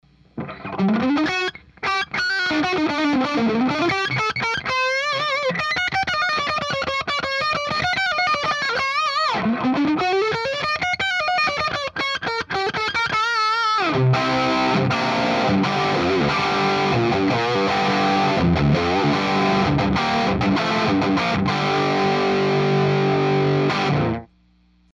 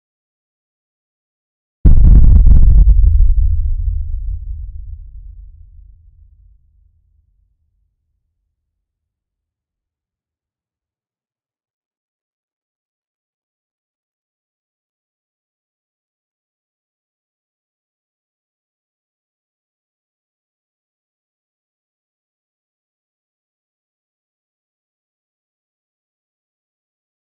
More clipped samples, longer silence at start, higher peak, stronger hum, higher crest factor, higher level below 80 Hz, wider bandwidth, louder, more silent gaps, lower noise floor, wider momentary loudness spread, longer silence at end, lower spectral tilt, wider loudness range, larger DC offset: neither; second, 0.35 s vs 1.85 s; second, -6 dBFS vs 0 dBFS; neither; about the same, 14 dB vs 18 dB; second, -46 dBFS vs -18 dBFS; first, 11.5 kHz vs 1.2 kHz; second, -20 LUFS vs -13 LUFS; neither; second, -57 dBFS vs under -90 dBFS; second, 4 LU vs 22 LU; second, 0.75 s vs 22.05 s; second, -5.5 dB/octave vs -13.5 dB/octave; second, 2 LU vs 19 LU; neither